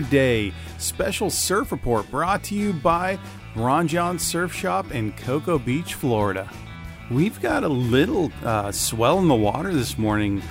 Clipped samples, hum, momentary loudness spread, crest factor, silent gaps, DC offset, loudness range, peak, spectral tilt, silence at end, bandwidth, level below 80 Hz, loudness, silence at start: under 0.1%; none; 8 LU; 18 dB; none; under 0.1%; 3 LU; -4 dBFS; -5 dB/octave; 0 s; 16 kHz; -42 dBFS; -23 LUFS; 0 s